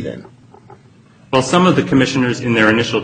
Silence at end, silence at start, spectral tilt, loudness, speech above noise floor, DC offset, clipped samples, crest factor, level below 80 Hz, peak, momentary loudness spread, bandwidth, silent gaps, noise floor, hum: 0 s; 0 s; -5.5 dB/octave; -14 LUFS; 32 dB; under 0.1%; under 0.1%; 16 dB; -48 dBFS; 0 dBFS; 8 LU; 9.4 kHz; none; -46 dBFS; none